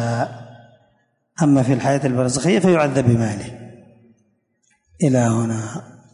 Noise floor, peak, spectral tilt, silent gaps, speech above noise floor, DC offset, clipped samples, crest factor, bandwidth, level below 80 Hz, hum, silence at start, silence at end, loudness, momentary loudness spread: -65 dBFS; -2 dBFS; -6.5 dB/octave; none; 47 dB; under 0.1%; under 0.1%; 16 dB; 11 kHz; -50 dBFS; none; 0 s; 0.3 s; -18 LUFS; 19 LU